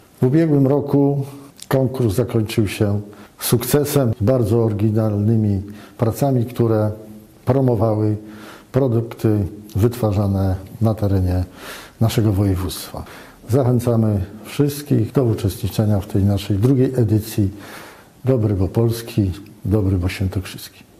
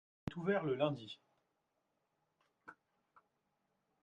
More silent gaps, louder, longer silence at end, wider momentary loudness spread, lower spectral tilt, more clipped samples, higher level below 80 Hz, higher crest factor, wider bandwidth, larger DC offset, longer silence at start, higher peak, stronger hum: neither; first, -19 LUFS vs -39 LUFS; second, 0.3 s vs 1.3 s; second, 12 LU vs 24 LU; about the same, -7.5 dB/octave vs -7.5 dB/octave; neither; first, -44 dBFS vs -76 dBFS; second, 14 dB vs 22 dB; first, 15.5 kHz vs 7.8 kHz; neither; about the same, 0.2 s vs 0.25 s; first, -4 dBFS vs -22 dBFS; neither